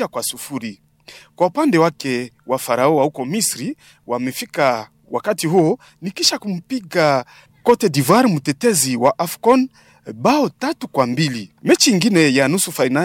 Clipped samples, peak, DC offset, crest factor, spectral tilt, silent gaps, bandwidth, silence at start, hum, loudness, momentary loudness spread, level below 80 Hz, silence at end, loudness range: under 0.1%; -2 dBFS; under 0.1%; 16 dB; -4 dB/octave; none; 17 kHz; 0 s; none; -17 LUFS; 12 LU; -60 dBFS; 0 s; 3 LU